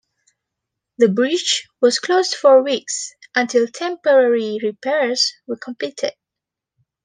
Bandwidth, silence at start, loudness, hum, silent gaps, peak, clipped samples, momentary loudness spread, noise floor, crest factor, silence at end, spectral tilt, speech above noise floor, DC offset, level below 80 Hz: 10 kHz; 1 s; -18 LUFS; none; none; -2 dBFS; under 0.1%; 12 LU; -85 dBFS; 16 dB; 0.95 s; -3 dB/octave; 68 dB; under 0.1%; -74 dBFS